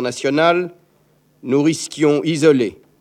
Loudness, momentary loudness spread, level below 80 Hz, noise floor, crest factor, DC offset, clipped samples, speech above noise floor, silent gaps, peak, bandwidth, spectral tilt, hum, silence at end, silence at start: -17 LUFS; 9 LU; -62 dBFS; -57 dBFS; 16 dB; under 0.1%; under 0.1%; 41 dB; none; -2 dBFS; 13.5 kHz; -5 dB/octave; none; 0.25 s; 0 s